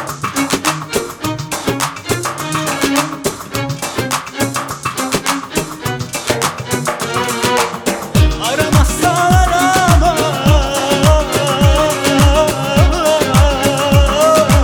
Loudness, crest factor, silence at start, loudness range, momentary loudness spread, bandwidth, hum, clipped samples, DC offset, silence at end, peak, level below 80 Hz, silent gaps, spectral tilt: -14 LUFS; 14 dB; 0 s; 6 LU; 9 LU; over 20 kHz; none; under 0.1%; under 0.1%; 0 s; 0 dBFS; -22 dBFS; none; -4.5 dB/octave